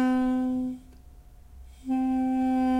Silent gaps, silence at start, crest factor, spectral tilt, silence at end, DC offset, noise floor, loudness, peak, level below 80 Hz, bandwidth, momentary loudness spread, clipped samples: none; 0 s; 10 dB; -6.5 dB/octave; 0 s; under 0.1%; -49 dBFS; -27 LUFS; -16 dBFS; -50 dBFS; 9.6 kHz; 13 LU; under 0.1%